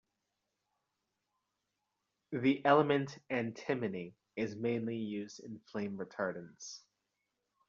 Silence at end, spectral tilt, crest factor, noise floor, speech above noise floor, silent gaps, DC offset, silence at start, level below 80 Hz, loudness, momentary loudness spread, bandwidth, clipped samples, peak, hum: 0.9 s; -5 dB/octave; 24 dB; -86 dBFS; 51 dB; none; under 0.1%; 2.3 s; -78 dBFS; -35 LUFS; 19 LU; 7.4 kHz; under 0.1%; -14 dBFS; none